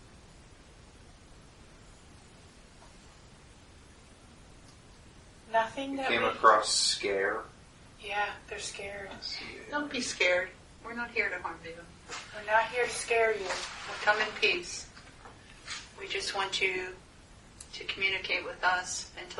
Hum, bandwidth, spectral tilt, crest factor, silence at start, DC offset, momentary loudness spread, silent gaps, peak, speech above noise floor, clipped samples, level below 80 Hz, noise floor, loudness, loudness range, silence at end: none; 11.5 kHz; -1.5 dB/octave; 26 dB; 0 s; under 0.1%; 19 LU; none; -8 dBFS; 23 dB; under 0.1%; -58 dBFS; -55 dBFS; -30 LUFS; 7 LU; 0 s